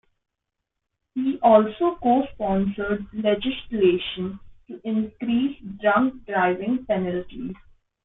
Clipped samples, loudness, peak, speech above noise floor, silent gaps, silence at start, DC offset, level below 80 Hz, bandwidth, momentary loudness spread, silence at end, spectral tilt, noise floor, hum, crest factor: under 0.1%; -23 LUFS; -4 dBFS; 60 dB; none; 1.15 s; under 0.1%; -52 dBFS; 4 kHz; 16 LU; 0.5 s; -10 dB/octave; -82 dBFS; none; 20 dB